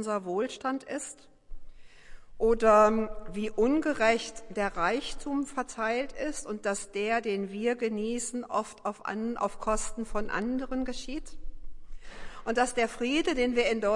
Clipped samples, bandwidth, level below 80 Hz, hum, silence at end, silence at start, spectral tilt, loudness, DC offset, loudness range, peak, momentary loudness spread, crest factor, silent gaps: under 0.1%; 11.5 kHz; -46 dBFS; none; 0 s; 0 s; -4 dB/octave; -30 LUFS; under 0.1%; 7 LU; -10 dBFS; 11 LU; 20 dB; none